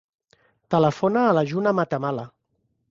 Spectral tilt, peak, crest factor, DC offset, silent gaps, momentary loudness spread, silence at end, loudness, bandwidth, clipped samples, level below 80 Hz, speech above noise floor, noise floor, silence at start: -7.5 dB/octave; -6 dBFS; 18 dB; under 0.1%; none; 10 LU; 0.65 s; -22 LUFS; 7.6 kHz; under 0.1%; -62 dBFS; 51 dB; -72 dBFS; 0.7 s